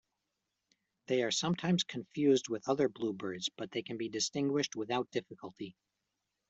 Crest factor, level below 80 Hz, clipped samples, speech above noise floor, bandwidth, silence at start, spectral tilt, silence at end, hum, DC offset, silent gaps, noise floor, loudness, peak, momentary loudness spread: 18 dB; -76 dBFS; under 0.1%; 52 dB; 8.2 kHz; 1.1 s; -4.5 dB/octave; 0.8 s; none; under 0.1%; none; -86 dBFS; -34 LUFS; -18 dBFS; 11 LU